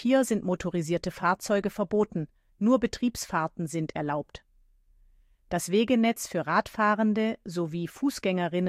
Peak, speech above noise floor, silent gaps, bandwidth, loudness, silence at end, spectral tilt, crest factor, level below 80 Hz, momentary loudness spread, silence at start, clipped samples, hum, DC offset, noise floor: -10 dBFS; 35 dB; none; 15.5 kHz; -28 LUFS; 0 s; -5.5 dB/octave; 18 dB; -56 dBFS; 8 LU; 0 s; under 0.1%; none; under 0.1%; -62 dBFS